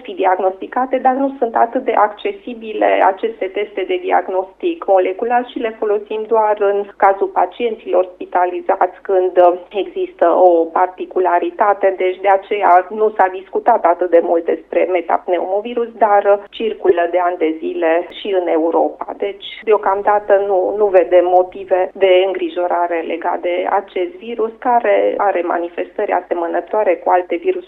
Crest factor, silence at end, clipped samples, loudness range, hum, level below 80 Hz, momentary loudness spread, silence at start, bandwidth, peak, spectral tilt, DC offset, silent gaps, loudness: 16 dB; 0 s; under 0.1%; 3 LU; none; -58 dBFS; 9 LU; 0 s; 4.1 kHz; 0 dBFS; -6.5 dB/octave; under 0.1%; none; -16 LUFS